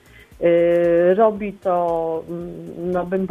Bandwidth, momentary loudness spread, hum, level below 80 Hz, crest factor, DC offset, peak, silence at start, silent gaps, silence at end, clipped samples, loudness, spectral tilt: 3.8 kHz; 14 LU; none; -50 dBFS; 14 dB; under 0.1%; -4 dBFS; 0.4 s; none; 0 s; under 0.1%; -19 LUFS; -8.5 dB/octave